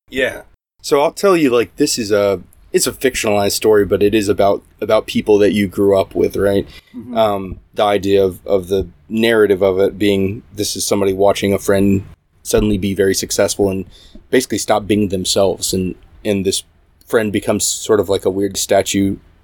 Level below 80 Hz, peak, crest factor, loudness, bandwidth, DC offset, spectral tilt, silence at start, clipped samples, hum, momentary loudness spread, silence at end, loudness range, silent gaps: -40 dBFS; 0 dBFS; 16 dB; -16 LUFS; 19.5 kHz; under 0.1%; -4.5 dB/octave; 0.1 s; under 0.1%; none; 8 LU; 0.25 s; 3 LU; none